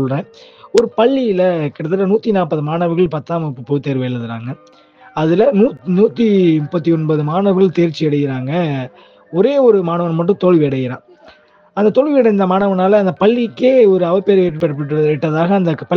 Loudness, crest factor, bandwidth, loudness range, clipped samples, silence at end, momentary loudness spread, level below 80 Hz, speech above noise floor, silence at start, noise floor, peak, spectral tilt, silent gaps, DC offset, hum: -14 LUFS; 14 dB; 8.4 kHz; 4 LU; under 0.1%; 0 s; 10 LU; -54 dBFS; 32 dB; 0 s; -46 dBFS; 0 dBFS; -8.5 dB/octave; none; under 0.1%; none